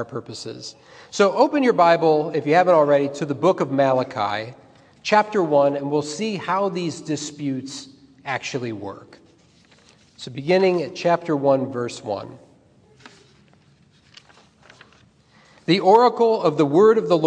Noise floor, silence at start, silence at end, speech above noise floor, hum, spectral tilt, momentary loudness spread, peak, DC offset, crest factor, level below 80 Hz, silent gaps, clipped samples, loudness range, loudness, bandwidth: -56 dBFS; 0 s; 0 s; 36 dB; none; -5.5 dB/octave; 18 LU; -2 dBFS; under 0.1%; 20 dB; -70 dBFS; none; under 0.1%; 12 LU; -20 LUFS; 9.8 kHz